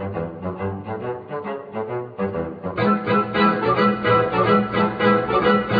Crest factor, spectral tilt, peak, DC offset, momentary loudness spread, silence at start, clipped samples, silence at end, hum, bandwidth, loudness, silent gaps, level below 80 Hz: 16 dB; -9 dB/octave; -4 dBFS; under 0.1%; 12 LU; 0 s; under 0.1%; 0 s; none; 5 kHz; -21 LUFS; none; -50 dBFS